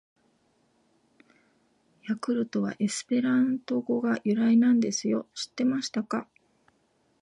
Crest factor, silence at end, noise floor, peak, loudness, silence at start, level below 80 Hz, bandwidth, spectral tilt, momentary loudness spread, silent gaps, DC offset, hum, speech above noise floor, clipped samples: 14 dB; 1 s; -69 dBFS; -14 dBFS; -27 LUFS; 2.05 s; -78 dBFS; 11 kHz; -5 dB/octave; 11 LU; none; under 0.1%; none; 43 dB; under 0.1%